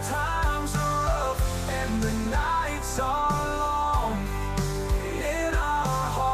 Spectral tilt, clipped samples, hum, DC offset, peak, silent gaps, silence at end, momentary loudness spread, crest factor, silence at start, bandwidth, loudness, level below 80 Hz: -5 dB/octave; under 0.1%; none; under 0.1%; -14 dBFS; none; 0 s; 3 LU; 12 dB; 0 s; 15 kHz; -27 LUFS; -32 dBFS